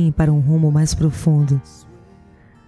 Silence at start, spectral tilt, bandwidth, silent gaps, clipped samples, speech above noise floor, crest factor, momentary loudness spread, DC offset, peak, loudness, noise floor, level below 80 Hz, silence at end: 0 s; -7.5 dB/octave; 11 kHz; none; under 0.1%; 31 dB; 14 dB; 4 LU; under 0.1%; -4 dBFS; -17 LUFS; -47 dBFS; -34 dBFS; 1.05 s